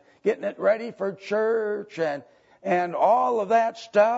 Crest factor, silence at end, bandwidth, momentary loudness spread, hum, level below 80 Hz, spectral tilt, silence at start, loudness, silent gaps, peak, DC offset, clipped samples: 18 dB; 0 s; 8 kHz; 9 LU; none; -78 dBFS; -6 dB/octave; 0.25 s; -24 LUFS; none; -6 dBFS; under 0.1%; under 0.1%